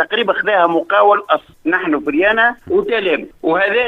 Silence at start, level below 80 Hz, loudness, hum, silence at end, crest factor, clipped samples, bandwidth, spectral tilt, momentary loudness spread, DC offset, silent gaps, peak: 0 s; -52 dBFS; -15 LUFS; none; 0 s; 14 dB; under 0.1%; 5.8 kHz; -6 dB/octave; 6 LU; under 0.1%; none; 0 dBFS